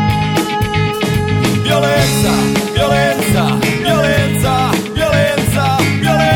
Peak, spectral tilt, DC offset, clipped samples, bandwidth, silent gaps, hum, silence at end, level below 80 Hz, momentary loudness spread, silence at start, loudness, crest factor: 0 dBFS; -5 dB/octave; under 0.1%; under 0.1%; 19 kHz; none; none; 0 s; -32 dBFS; 3 LU; 0 s; -13 LUFS; 12 dB